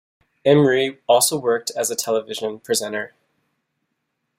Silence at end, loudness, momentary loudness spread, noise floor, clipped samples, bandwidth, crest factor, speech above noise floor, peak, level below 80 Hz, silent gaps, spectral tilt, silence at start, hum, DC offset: 1.3 s; -20 LUFS; 12 LU; -75 dBFS; under 0.1%; 16 kHz; 18 dB; 56 dB; -2 dBFS; -64 dBFS; none; -3.5 dB/octave; 0.45 s; none; under 0.1%